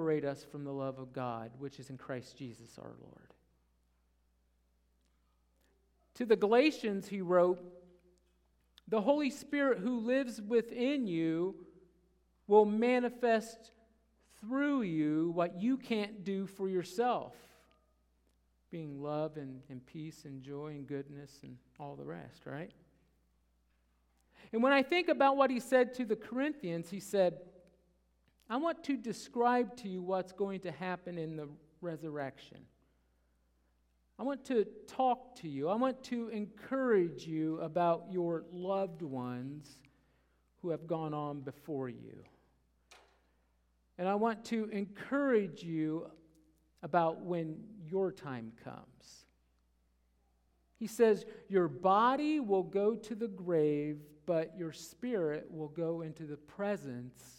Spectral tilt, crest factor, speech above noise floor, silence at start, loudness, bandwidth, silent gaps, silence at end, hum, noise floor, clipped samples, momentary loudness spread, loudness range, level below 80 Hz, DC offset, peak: -6.5 dB/octave; 22 dB; 40 dB; 0 s; -35 LUFS; 16 kHz; none; 0.05 s; none; -74 dBFS; under 0.1%; 18 LU; 13 LU; -74 dBFS; under 0.1%; -14 dBFS